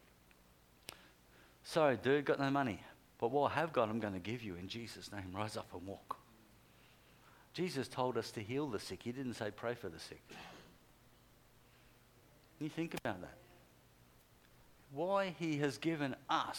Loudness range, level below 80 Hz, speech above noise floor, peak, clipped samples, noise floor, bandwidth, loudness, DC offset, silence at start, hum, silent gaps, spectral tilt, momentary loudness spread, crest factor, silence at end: 12 LU; -72 dBFS; 28 dB; -18 dBFS; under 0.1%; -67 dBFS; 19 kHz; -39 LUFS; under 0.1%; 0.9 s; none; none; -5.5 dB/octave; 19 LU; 24 dB; 0 s